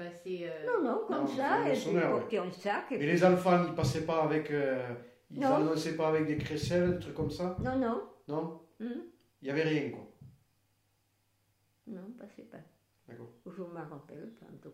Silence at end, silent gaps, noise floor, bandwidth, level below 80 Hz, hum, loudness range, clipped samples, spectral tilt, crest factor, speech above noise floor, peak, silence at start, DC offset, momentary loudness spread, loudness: 0 s; none; -75 dBFS; 15.5 kHz; -60 dBFS; none; 19 LU; under 0.1%; -6.5 dB/octave; 20 dB; 42 dB; -14 dBFS; 0 s; under 0.1%; 20 LU; -32 LUFS